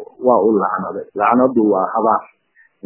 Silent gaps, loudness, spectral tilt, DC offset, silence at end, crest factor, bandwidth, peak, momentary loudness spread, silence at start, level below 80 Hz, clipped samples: none; -16 LUFS; -11.5 dB/octave; under 0.1%; 0.6 s; 16 dB; 3.1 kHz; 0 dBFS; 7 LU; 0 s; -60 dBFS; under 0.1%